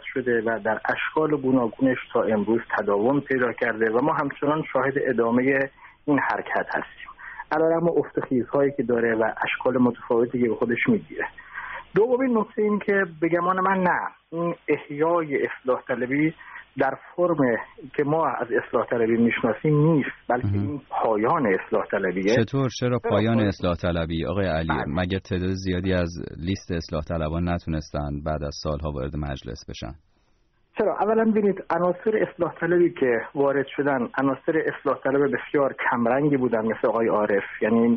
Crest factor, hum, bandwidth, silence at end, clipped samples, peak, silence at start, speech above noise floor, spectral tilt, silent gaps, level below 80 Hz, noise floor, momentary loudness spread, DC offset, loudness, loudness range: 16 dB; none; 6.2 kHz; 0 s; under 0.1%; -8 dBFS; 0 s; 40 dB; -6 dB/octave; none; -46 dBFS; -64 dBFS; 8 LU; under 0.1%; -24 LUFS; 4 LU